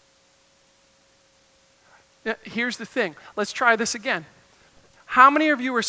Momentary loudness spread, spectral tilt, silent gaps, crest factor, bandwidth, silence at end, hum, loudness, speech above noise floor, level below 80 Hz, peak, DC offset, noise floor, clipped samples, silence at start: 15 LU; -2.5 dB/octave; none; 24 dB; 8 kHz; 0 s; none; -21 LUFS; 38 dB; -68 dBFS; -2 dBFS; under 0.1%; -60 dBFS; under 0.1%; 2.25 s